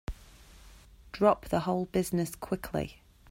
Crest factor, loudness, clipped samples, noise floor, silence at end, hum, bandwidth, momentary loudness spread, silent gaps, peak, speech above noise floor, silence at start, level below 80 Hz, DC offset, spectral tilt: 22 dB; -31 LUFS; under 0.1%; -54 dBFS; 0.4 s; none; 16 kHz; 18 LU; none; -10 dBFS; 24 dB; 0.1 s; -50 dBFS; under 0.1%; -6 dB/octave